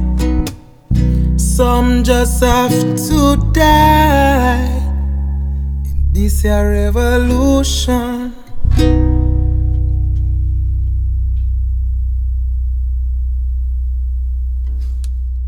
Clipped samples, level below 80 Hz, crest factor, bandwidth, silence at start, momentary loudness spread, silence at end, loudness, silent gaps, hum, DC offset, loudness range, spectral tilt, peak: under 0.1%; -16 dBFS; 12 dB; 18.5 kHz; 0 s; 9 LU; 0 s; -15 LUFS; none; none; under 0.1%; 7 LU; -6 dB/octave; 0 dBFS